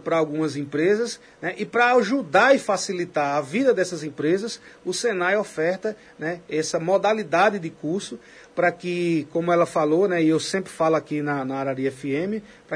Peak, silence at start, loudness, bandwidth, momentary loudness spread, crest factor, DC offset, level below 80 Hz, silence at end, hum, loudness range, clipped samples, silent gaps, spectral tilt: -4 dBFS; 0.05 s; -23 LUFS; 11 kHz; 11 LU; 18 dB; under 0.1%; -68 dBFS; 0 s; none; 3 LU; under 0.1%; none; -5 dB/octave